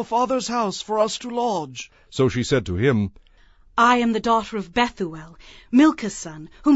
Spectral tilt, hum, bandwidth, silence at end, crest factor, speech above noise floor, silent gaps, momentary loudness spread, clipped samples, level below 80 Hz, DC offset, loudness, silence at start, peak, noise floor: -5 dB/octave; none; 8 kHz; 0 s; 18 dB; 31 dB; none; 14 LU; under 0.1%; -50 dBFS; under 0.1%; -21 LUFS; 0 s; -4 dBFS; -52 dBFS